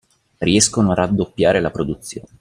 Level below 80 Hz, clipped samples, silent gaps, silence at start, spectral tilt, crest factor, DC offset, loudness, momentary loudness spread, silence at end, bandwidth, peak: -44 dBFS; under 0.1%; none; 0.4 s; -4.5 dB/octave; 18 dB; under 0.1%; -17 LUFS; 11 LU; 0.2 s; 15.5 kHz; 0 dBFS